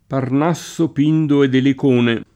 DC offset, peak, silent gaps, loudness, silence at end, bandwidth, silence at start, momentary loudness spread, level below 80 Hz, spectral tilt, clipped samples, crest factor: under 0.1%; -4 dBFS; none; -16 LUFS; 0.1 s; 13 kHz; 0.1 s; 6 LU; -58 dBFS; -7 dB/octave; under 0.1%; 12 dB